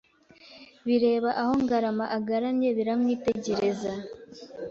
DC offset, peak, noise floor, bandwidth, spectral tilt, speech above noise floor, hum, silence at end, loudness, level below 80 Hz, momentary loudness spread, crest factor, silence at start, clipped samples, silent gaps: under 0.1%; -12 dBFS; -55 dBFS; 7.6 kHz; -6 dB/octave; 28 dB; none; 0 s; -27 LUFS; -62 dBFS; 14 LU; 14 dB; 0.45 s; under 0.1%; none